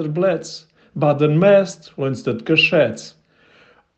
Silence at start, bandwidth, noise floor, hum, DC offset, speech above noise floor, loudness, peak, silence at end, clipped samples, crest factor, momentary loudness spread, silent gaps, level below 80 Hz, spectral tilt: 0 s; 8.6 kHz; -53 dBFS; none; under 0.1%; 36 dB; -17 LUFS; -2 dBFS; 0.9 s; under 0.1%; 16 dB; 20 LU; none; -64 dBFS; -6 dB/octave